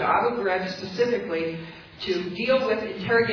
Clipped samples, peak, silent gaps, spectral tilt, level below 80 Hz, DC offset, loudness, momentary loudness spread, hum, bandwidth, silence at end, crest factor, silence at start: under 0.1%; -10 dBFS; none; -5.5 dB/octave; -58 dBFS; under 0.1%; -25 LUFS; 9 LU; none; 5.4 kHz; 0 s; 16 dB; 0 s